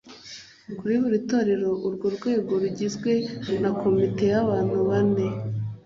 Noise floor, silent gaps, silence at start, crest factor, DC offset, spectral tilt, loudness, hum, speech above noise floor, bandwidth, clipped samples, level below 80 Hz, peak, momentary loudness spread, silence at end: -45 dBFS; none; 0.05 s; 14 dB; under 0.1%; -7 dB/octave; -24 LUFS; none; 21 dB; 7.6 kHz; under 0.1%; -56 dBFS; -10 dBFS; 10 LU; 0.05 s